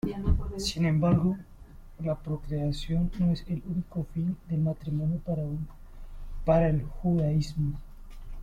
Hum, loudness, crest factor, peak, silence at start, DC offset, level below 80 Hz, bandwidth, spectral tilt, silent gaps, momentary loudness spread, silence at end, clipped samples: none; -29 LUFS; 18 dB; -10 dBFS; 0.05 s; under 0.1%; -38 dBFS; 12 kHz; -7.5 dB/octave; none; 11 LU; 0 s; under 0.1%